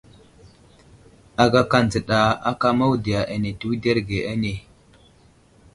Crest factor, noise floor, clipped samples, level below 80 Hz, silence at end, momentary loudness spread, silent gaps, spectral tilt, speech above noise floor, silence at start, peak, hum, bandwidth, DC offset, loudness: 22 dB; -54 dBFS; under 0.1%; -46 dBFS; 1.15 s; 9 LU; none; -6 dB/octave; 34 dB; 0.45 s; 0 dBFS; none; 11.5 kHz; under 0.1%; -21 LUFS